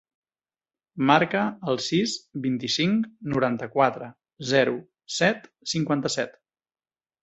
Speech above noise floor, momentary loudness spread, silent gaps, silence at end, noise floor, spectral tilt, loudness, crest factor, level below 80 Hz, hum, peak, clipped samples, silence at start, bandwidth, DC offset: over 66 dB; 13 LU; none; 0.9 s; under -90 dBFS; -4.5 dB/octave; -25 LUFS; 24 dB; -64 dBFS; none; -2 dBFS; under 0.1%; 0.95 s; 8.2 kHz; under 0.1%